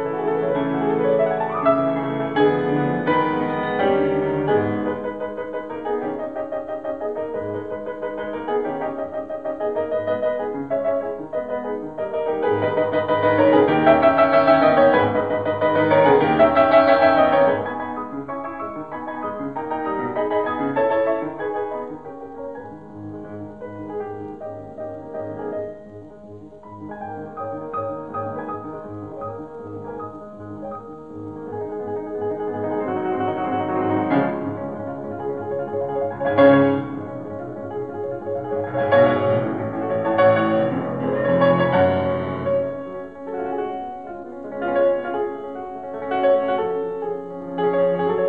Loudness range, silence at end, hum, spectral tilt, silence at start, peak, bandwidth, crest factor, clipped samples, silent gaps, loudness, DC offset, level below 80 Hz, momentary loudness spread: 15 LU; 0 s; none; -9 dB/octave; 0 s; -2 dBFS; 4.9 kHz; 20 dB; under 0.1%; none; -21 LUFS; 0.3%; -56 dBFS; 18 LU